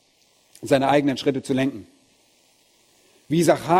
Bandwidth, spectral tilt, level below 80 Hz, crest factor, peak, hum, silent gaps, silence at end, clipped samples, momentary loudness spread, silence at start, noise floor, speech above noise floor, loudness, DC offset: 16 kHz; -5.5 dB/octave; -60 dBFS; 20 dB; -4 dBFS; none; none; 0 s; under 0.1%; 11 LU; 0.6 s; -61 dBFS; 41 dB; -21 LUFS; under 0.1%